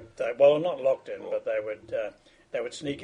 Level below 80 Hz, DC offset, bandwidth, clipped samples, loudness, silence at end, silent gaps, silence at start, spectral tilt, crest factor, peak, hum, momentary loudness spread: -66 dBFS; under 0.1%; 10 kHz; under 0.1%; -28 LUFS; 0 s; none; 0 s; -5 dB/octave; 20 dB; -8 dBFS; none; 13 LU